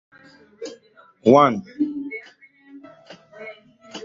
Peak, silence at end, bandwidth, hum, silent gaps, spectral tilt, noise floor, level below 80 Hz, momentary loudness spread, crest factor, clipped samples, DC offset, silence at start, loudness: -2 dBFS; 0 s; 7.6 kHz; none; none; -6.5 dB/octave; -53 dBFS; -66 dBFS; 25 LU; 22 dB; under 0.1%; under 0.1%; 0.6 s; -19 LUFS